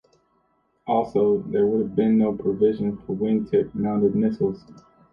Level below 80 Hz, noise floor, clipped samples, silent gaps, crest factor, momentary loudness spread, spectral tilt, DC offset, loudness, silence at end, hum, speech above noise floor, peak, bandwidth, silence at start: -56 dBFS; -67 dBFS; under 0.1%; none; 14 dB; 7 LU; -10.5 dB/octave; under 0.1%; -23 LUFS; 0.35 s; none; 45 dB; -8 dBFS; 5.4 kHz; 0.85 s